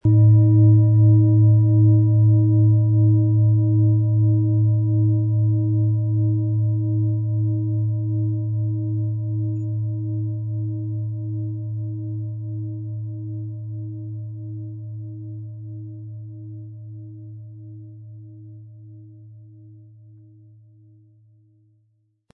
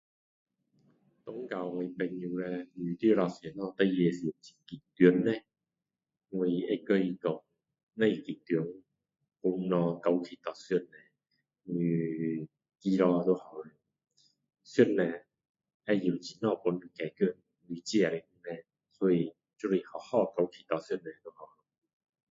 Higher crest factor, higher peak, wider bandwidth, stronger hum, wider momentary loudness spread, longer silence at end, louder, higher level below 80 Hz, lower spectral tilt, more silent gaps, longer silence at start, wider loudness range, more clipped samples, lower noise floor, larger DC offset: second, 14 dB vs 24 dB; first, -6 dBFS vs -10 dBFS; second, 1 kHz vs 7.8 kHz; neither; first, 22 LU vs 18 LU; first, 2.6 s vs 0.85 s; first, -19 LUFS vs -32 LUFS; first, -58 dBFS vs -76 dBFS; first, -16 dB/octave vs -7 dB/octave; second, none vs 7.83-7.87 s, 15.49-15.54 s, 15.74-15.80 s; second, 0.05 s vs 1.25 s; first, 22 LU vs 4 LU; neither; second, -66 dBFS vs under -90 dBFS; neither